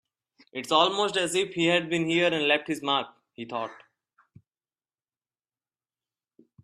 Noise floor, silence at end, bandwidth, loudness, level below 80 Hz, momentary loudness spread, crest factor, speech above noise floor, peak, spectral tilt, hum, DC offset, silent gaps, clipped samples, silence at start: under -90 dBFS; 2.9 s; 14 kHz; -25 LUFS; -74 dBFS; 16 LU; 22 dB; over 64 dB; -6 dBFS; -3.5 dB/octave; none; under 0.1%; none; under 0.1%; 0.55 s